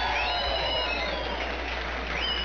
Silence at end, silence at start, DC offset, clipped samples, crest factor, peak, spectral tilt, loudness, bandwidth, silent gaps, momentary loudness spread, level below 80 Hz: 0 s; 0 s; 0.4%; under 0.1%; 12 dB; -16 dBFS; -4 dB/octave; -28 LUFS; 7 kHz; none; 5 LU; -38 dBFS